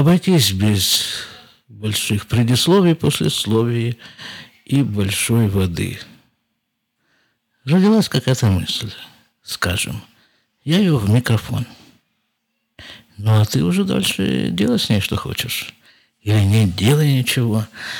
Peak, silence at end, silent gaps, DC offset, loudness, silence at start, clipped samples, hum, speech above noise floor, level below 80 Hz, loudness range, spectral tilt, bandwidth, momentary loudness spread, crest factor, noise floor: -2 dBFS; 0 s; none; under 0.1%; -17 LUFS; 0 s; under 0.1%; none; 56 dB; -46 dBFS; 4 LU; -5 dB/octave; over 20 kHz; 18 LU; 16 dB; -73 dBFS